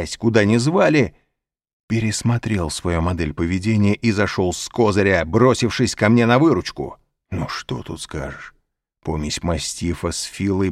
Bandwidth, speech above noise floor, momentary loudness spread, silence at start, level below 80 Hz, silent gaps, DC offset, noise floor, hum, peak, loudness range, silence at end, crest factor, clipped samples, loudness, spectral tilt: 14 kHz; 58 dB; 13 LU; 0 s; -40 dBFS; 1.73-1.88 s; under 0.1%; -76 dBFS; none; -2 dBFS; 9 LU; 0 s; 18 dB; under 0.1%; -19 LUFS; -5.5 dB/octave